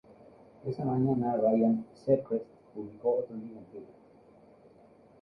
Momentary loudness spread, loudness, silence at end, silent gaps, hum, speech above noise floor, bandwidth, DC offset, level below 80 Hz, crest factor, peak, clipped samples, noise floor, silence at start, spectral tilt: 19 LU; -30 LUFS; 1.3 s; none; none; 28 dB; 5.6 kHz; under 0.1%; -68 dBFS; 18 dB; -14 dBFS; under 0.1%; -58 dBFS; 0.65 s; -11.5 dB/octave